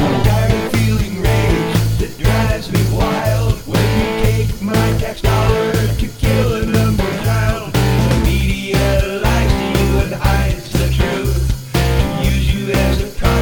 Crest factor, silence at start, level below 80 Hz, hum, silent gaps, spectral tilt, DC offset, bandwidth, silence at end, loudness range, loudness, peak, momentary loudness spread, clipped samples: 14 dB; 0 s; -20 dBFS; none; none; -6 dB/octave; 0.7%; over 20 kHz; 0 s; 1 LU; -16 LUFS; -2 dBFS; 3 LU; under 0.1%